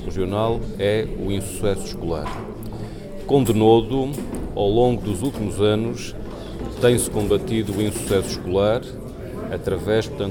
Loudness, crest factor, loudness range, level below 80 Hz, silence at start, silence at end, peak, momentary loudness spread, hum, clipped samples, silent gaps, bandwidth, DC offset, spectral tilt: -22 LUFS; 18 dB; 3 LU; -36 dBFS; 0 s; 0 s; -4 dBFS; 15 LU; none; under 0.1%; none; 19 kHz; under 0.1%; -6 dB/octave